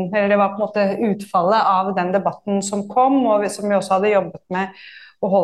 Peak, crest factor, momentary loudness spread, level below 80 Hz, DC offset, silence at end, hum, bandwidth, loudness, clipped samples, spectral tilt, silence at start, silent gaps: -4 dBFS; 14 dB; 9 LU; -66 dBFS; under 0.1%; 0 s; none; 12.5 kHz; -19 LUFS; under 0.1%; -5.5 dB/octave; 0 s; none